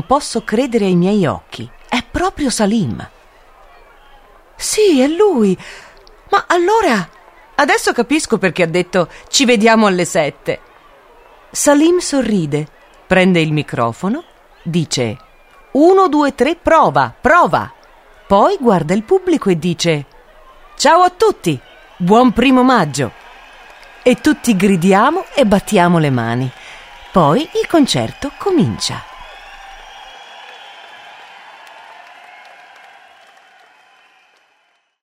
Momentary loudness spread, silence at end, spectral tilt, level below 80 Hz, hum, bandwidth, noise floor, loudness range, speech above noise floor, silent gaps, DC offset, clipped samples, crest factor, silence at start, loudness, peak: 20 LU; 3.1 s; -5 dB/octave; -44 dBFS; none; 16 kHz; -60 dBFS; 5 LU; 47 dB; none; under 0.1%; under 0.1%; 16 dB; 0.1 s; -14 LUFS; 0 dBFS